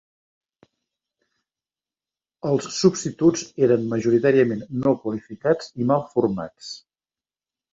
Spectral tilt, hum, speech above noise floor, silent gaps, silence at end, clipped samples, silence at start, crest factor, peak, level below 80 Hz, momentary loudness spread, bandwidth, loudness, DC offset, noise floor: -6 dB/octave; none; over 69 dB; none; 0.95 s; under 0.1%; 2.45 s; 20 dB; -4 dBFS; -60 dBFS; 13 LU; 7.8 kHz; -22 LUFS; under 0.1%; under -90 dBFS